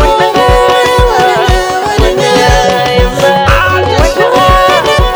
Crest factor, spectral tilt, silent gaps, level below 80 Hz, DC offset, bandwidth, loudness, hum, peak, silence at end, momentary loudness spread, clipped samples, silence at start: 8 dB; -4.5 dB/octave; none; -16 dBFS; under 0.1%; over 20 kHz; -8 LUFS; none; 0 dBFS; 0 s; 3 LU; 2%; 0 s